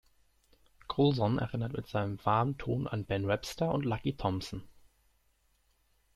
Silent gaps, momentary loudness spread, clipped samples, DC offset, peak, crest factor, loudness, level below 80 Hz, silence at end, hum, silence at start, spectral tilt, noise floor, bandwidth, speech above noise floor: none; 8 LU; under 0.1%; under 0.1%; -14 dBFS; 18 dB; -33 LUFS; -56 dBFS; 1.35 s; none; 0.9 s; -7 dB/octave; -72 dBFS; 14 kHz; 40 dB